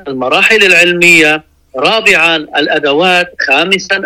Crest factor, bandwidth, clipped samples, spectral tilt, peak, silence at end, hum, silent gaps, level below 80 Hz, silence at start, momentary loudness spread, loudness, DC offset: 10 dB; 17 kHz; 0.5%; -3 dB/octave; 0 dBFS; 0 s; none; none; -48 dBFS; 0.05 s; 8 LU; -7 LUFS; under 0.1%